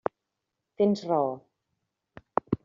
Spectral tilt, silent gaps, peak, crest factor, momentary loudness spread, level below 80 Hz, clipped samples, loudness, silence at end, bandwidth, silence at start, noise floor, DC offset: -7 dB/octave; none; -6 dBFS; 26 dB; 10 LU; -66 dBFS; under 0.1%; -28 LUFS; 0.1 s; 7.4 kHz; 0.8 s; -84 dBFS; under 0.1%